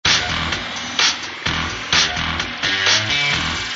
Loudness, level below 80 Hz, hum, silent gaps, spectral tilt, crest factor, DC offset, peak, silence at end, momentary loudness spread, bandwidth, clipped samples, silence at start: -17 LUFS; -38 dBFS; none; none; -1.5 dB/octave; 16 dB; under 0.1%; -2 dBFS; 0 s; 7 LU; 8 kHz; under 0.1%; 0.05 s